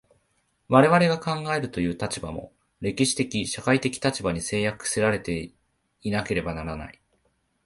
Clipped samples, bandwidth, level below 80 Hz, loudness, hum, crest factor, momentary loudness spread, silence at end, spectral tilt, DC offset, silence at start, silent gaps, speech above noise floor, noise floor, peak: under 0.1%; 11.5 kHz; -50 dBFS; -25 LUFS; none; 22 dB; 15 LU; 0.75 s; -4.5 dB/octave; under 0.1%; 0.7 s; none; 46 dB; -70 dBFS; -2 dBFS